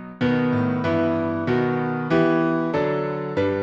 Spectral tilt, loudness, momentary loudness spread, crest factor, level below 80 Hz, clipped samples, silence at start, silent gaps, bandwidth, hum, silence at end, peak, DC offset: -8.5 dB/octave; -22 LUFS; 4 LU; 14 dB; -54 dBFS; under 0.1%; 0 s; none; 7.2 kHz; none; 0 s; -8 dBFS; under 0.1%